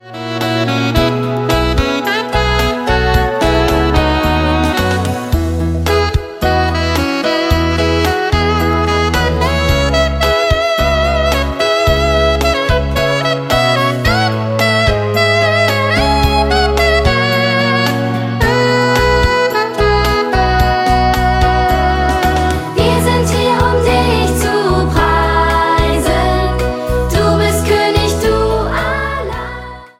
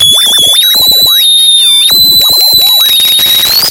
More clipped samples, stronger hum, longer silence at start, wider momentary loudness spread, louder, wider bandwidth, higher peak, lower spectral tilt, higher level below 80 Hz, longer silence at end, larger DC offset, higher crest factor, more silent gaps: second, under 0.1% vs 0.7%; neither; about the same, 0.05 s vs 0 s; first, 4 LU vs 1 LU; second, -13 LUFS vs -2 LUFS; second, 16.5 kHz vs over 20 kHz; about the same, 0 dBFS vs 0 dBFS; first, -5 dB/octave vs 1 dB/octave; first, -20 dBFS vs -40 dBFS; first, 0.15 s vs 0 s; neither; first, 12 dB vs 6 dB; neither